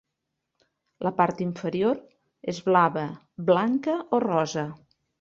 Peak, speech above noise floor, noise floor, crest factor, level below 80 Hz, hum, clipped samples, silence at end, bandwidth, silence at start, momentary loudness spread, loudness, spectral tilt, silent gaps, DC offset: -6 dBFS; 57 dB; -82 dBFS; 20 dB; -68 dBFS; none; under 0.1%; 0.45 s; 7.6 kHz; 1 s; 12 LU; -25 LUFS; -6.5 dB/octave; none; under 0.1%